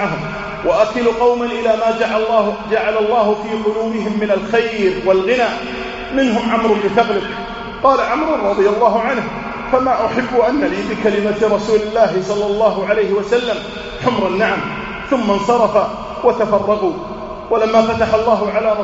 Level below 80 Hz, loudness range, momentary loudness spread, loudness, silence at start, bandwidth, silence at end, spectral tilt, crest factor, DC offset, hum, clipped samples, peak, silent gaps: -42 dBFS; 1 LU; 7 LU; -16 LUFS; 0 s; 8 kHz; 0 s; -3.5 dB/octave; 16 dB; under 0.1%; none; under 0.1%; 0 dBFS; none